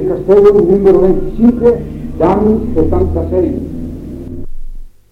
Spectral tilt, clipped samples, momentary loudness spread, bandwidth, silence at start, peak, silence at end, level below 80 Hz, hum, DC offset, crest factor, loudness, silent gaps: -10 dB/octave; under 0.1%; 18 LU; 5.4 kHz; 0 s; 0 dBFS; 0.25 s; -24 dBFS; none; under 0.1%; 12 dB; -11 LUFS; none